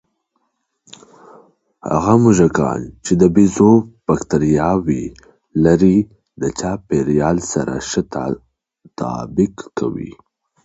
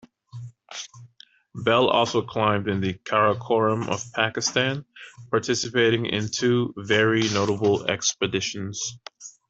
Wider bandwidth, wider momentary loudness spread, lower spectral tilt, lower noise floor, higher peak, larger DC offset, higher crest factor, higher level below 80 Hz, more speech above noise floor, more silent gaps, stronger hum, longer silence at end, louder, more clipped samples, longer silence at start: about the same, 8.2 kHz vs 8.2 kHz; second, 13 LU vs 18 LU; first, -7 dB/octave vs -4 dB/octave; first, -70 dBFS vs -53 dBFS; first, 0 dBFS vs -4 dBFS; neither; about the same, 16 dB vs 20 dB; first, -42 dBFS vs -62 dBFS; first, 54 dB vs 30 dB; neither; neither; first, 0.55 s vs 0.2 s; first, -16 LUFS vs -23 LUFS; neither; first, 1.85 s vs 0.35 s